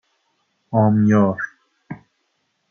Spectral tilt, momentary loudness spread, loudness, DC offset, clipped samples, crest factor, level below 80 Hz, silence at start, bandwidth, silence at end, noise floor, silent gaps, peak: -9.5 dB/octave; 23 LU; -18 LUFS; under 0.1%; under 0.1%; 18 dB; -66 dBFS; 0.7 s; 6.6 kHz; 0.75 s; -70 dBFS; none; -4 dBFS